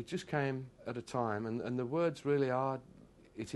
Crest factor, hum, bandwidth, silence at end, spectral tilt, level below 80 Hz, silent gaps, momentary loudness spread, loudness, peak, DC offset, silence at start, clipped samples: 18 dB; none; 12 kHz; 0 s; -7 dB/octave; -70 dBFS; none; 11 LU; -36 LUFS; -20 dBFS; under 0.1%; 0 s; under 0.1%